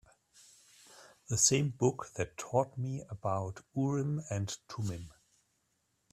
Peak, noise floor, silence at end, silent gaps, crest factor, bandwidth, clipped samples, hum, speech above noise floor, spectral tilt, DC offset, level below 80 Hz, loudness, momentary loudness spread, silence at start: -12 dBFS; -78 dBFS; 1 s; none; 24 dB; 14.5 kHz; under 0.1%; none; 44 dB; -4.5 dB/octave; under 0.1%; -66 dBFS; -33 LUFS; 13 LU; 0.9 s